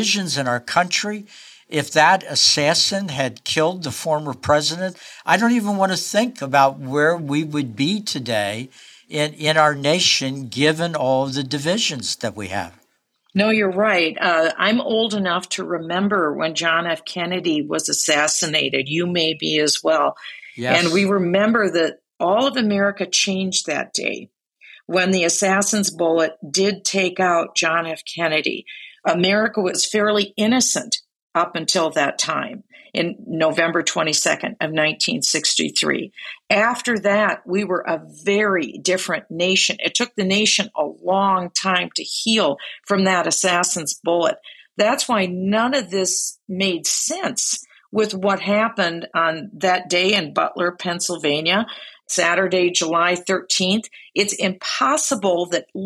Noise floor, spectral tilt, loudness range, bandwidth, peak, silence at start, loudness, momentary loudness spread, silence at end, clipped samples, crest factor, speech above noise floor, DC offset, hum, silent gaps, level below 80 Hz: -65 dBFS; -3 dB/octave; 2 LU; 15 kHz; -2 dBFS; 0 s; -19 LUFS; 8 LU; 0 s; under 0.1%; 18 dB; 45 dB; under 0.1%; none; 31.16-31.28 s; -66 dBFS